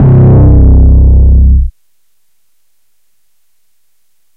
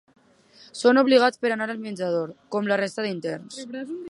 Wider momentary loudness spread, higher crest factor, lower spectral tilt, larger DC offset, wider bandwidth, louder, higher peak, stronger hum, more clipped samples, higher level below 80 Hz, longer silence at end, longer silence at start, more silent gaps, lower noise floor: second, 6 LU vs 17 LU; second, 6 dB vs 20 dB; first, -13 dB/octave vs -5 dB/octave; neither; second, 1.9 kHz vs 11.5 kHz; first, -6 LUFS vs -23 LUFS; first, 0 dBFS vs -4 dBFS; neither; neither; first, -8 dBFS vs -76 dBFS; first, 2.65 s vs 0 s; second, 0 s vs 0.75 s; neither; first, -62 dBFS vs -54 dBFS